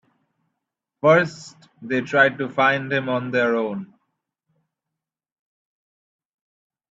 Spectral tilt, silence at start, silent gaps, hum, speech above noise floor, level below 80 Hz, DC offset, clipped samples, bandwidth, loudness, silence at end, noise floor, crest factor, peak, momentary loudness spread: -6 dB/octave; 1.05 s; none; none; 65 dB; -70 dBFS; under 0.1%; under 0.1%; 8 kHz; -20 LUFS; 3.05 s; -85 dBFS; 22 dB; -2 dBFS; 11 LU